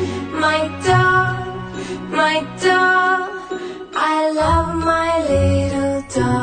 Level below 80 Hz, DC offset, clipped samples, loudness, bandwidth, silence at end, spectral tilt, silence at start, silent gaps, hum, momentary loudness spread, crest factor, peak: -36 dBFS; under 0.1%; under 0.1%; -17 LUFS; 9.4 kHz; 0 s; -5.5 dB/octave; 0 s; none; none; 14 LU; 14 dB; -4 dBFS